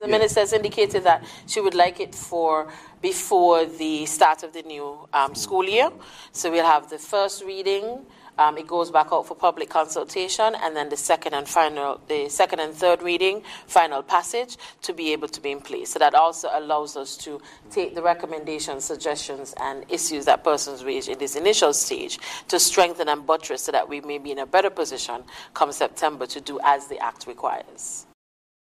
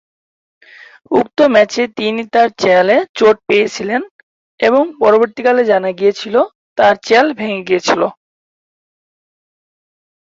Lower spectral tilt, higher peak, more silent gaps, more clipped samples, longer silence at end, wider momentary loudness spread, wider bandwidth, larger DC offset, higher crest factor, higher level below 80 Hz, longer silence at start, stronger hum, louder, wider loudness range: second, -2 dB/octave vs -4.5 dB/octave; second, -4 dBFS vs 0 dBFS; second, none vs 3.09-3.14 s, 4.11-4.58 s, 6.55-6.76 s; neither; second, 0.7 s vs 2.1 s; first, 13 LU vs 8 LU; first, 15.5 kHz vs 7.8 kHz; neither; about the same, 18 dB vs 14 dB; about the same, -62 dBFS vs -58 dBFS; second, 0 s vs 1.1 s; neither; second, -23 LUFS vs -13 LUFS; about the same, 4 LU vs 3 LU